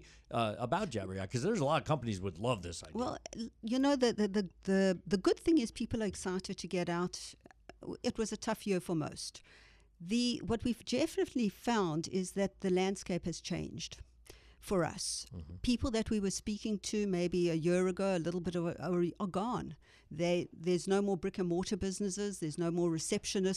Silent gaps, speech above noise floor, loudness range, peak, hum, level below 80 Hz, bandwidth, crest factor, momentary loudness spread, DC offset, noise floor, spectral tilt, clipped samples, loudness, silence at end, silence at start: none; 24 dB; 5 LU; -18 dBFS; none; -58 dBFS; 14.5 kHz; 18 dB; 9 LU; under 0.1%; -58 dBFS; -5 dB/octave; under 0.1%; -35 LUFS; 0 s; 0 s